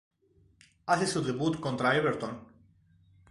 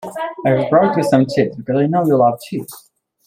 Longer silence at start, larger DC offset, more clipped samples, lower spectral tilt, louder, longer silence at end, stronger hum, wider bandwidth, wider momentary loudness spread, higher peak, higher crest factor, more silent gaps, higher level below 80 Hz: first, 0.85 s vs 0 s; neither; neither; second, -5 dB/octave vs -7.5 dB/octave; second, -29 LUFS vs -16 LUFS; first, 0.85 s vs 0.45 s; neither; second, 11.5 kHz vs 16 kHz; about the same, 14 LU vs 13 LU; second, -10 dBFS vs -2 dBFS; first, 22 dB vs 14 dB; neither; second, -64 dBFS vs -56 dBFS